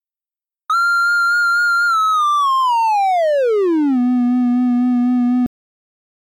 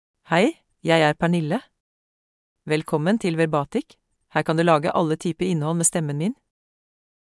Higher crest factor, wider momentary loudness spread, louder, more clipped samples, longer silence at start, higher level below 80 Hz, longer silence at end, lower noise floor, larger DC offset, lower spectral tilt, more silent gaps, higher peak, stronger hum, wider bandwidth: second, 6 dB vs 18 dB; second, 2 LU vs 10 LU; first, -15 LUFS vs -22 LUFS; neither; first, 0.7 s vs 0.3 s; about the same, -64 dBFS vs -60 dBFS; about the same, 0.85 s vs 0.9 s; about the same, under -90 dBFS vs under -90 dBFS; neither; second, -3.5 dB/octave vs -5 dB/octave; second, none vs 1.80-2.56 s; second, -10 dBFS vs -4 dBFS; neither; first, 15.5 kHz vs 12 kHz